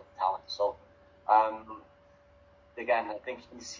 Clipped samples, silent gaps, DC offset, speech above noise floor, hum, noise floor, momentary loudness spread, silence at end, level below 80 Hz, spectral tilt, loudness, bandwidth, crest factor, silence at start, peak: under 0.1%; none; under 0.1%; 29 dB; none; -60 dBFS; 23 LU; 0 s; -66 dBFS; -2.5 dB/octave; -30 LUFS; 7.6 kHz; 22 dB; 0.2 s; -12 dBFS